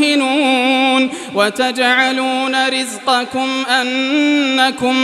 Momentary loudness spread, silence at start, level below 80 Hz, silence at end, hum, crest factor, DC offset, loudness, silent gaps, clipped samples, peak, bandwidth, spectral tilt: 4 LU; 0 s; -64 dBFS; 0 s; none; 14 dB; under 0.1%; -14 LUFS; none; under 0.1%; 0 dBFS; 13 kHz; -2 dB/octave